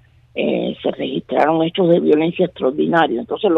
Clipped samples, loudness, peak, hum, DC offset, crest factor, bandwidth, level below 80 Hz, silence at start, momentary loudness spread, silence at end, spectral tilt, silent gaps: under 0.1%; -17 LUFS; -4 dBFS; none; under 0.1%; 14 dB; 5.4 kHz; -56 dBFS; 0.35 s; 8 LU; 0 s; -8.5 dB/octave; none